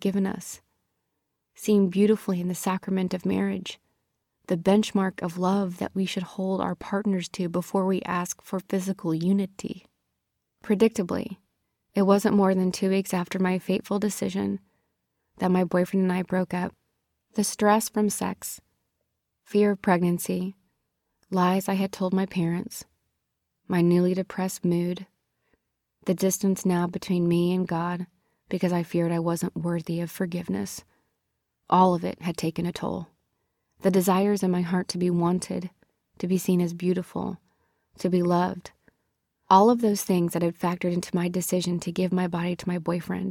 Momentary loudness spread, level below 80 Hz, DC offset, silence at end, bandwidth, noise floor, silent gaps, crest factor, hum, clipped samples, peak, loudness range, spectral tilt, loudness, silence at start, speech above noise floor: 12 LU; -64 dBFS; under 0.1%; 0 s; 16.5 kHz; -80 dBFS; none; 20 dB; none; under 0.1%; -6 dBFS; 4 LU; -6 dB/octave; -26 LUFS; 0 s; 55 dB